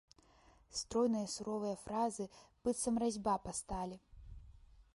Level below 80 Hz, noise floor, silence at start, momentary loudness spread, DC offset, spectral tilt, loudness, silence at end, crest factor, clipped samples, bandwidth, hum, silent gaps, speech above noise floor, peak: -60 dBFS; -67 dBFS; 0.7 s; 20 LU; under 0.1%; -4.5 dB/octave; -39 LUFS; 0.15 s; 16 dB; under 0.1%; 11.5 kHz; none; none; 29 dB; -24 dBFS